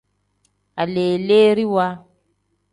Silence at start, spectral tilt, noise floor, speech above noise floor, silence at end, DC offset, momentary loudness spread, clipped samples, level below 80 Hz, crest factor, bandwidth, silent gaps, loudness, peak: 0.75 s; -7 dB/octave; -68 dBFS; 51 dB; 0.75 s; under 0.1%; 16 LU; under 0.1%; -62 dBFS; 16 dB; 10.5 kHz; none; -18 LUFS; -4 dBFS